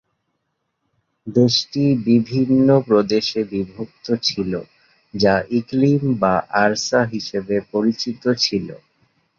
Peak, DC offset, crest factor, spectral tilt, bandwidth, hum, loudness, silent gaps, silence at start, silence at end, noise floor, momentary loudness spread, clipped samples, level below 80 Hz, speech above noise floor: -2 dBFS; under 0.1%; 18 dB; -5.5 dB/octave; 7.4 kHz; none; -19 LUFS; none; 1.25 s; 0.65 s; -73 dBFS; 10 LU; under 0.1%; -54 dBFS; 55 dB